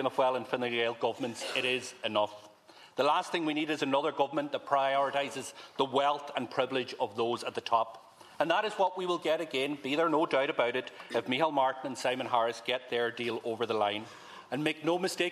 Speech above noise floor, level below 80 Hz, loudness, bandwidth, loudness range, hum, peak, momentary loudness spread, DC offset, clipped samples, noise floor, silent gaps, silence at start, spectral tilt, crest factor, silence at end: 25 dB; -82 dBFS; -31 LUFS; 14 kHz; 2 LU; none; -12 dBFS; 7 LU; under 0.1%; under 0.1%; -56 dBFS; none; 0 s; -4 dB/octave; 20 dB; 0 s